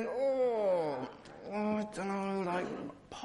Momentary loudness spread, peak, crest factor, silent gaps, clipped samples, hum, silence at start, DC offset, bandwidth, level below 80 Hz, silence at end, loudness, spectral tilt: 13 LU; -22 dBFS; 12 dB; none; under 0.1%; none; 0 s; under 0.1%; 11 kHz; -70 dBFS; 0 s; -35 LUFS; -6.5 dB/octave